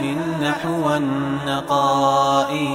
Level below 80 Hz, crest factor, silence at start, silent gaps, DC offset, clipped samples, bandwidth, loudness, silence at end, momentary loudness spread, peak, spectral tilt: -52 dBFS; 16 dB; 0 s; none; under 0.1%; under 0.1%; 16 kHz; -19 LUFS; 0 s; 6 LU; -4 dBFS; -5.5 dB/octave